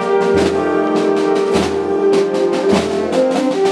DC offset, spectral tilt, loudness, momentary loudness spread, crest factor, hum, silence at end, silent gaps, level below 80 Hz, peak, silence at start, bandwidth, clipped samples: under 0.1%; -5.5 dB/octave; -15 LUFS; 2 LU; 12 dB; none; 0 s; none; -44 dBFS; -2 dBFS; 0 s; 12 kHz; under 0.1%